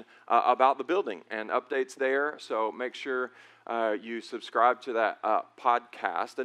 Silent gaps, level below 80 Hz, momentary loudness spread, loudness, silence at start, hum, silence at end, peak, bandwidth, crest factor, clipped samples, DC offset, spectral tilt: none; under -90 dBFS; 11 LU; -29 LUFS; 0 s; none; 0 s; -8 dBFS; 11.5 kHz; 20 dB; under 0.1%; under 0.1%; -3.5 dB/octave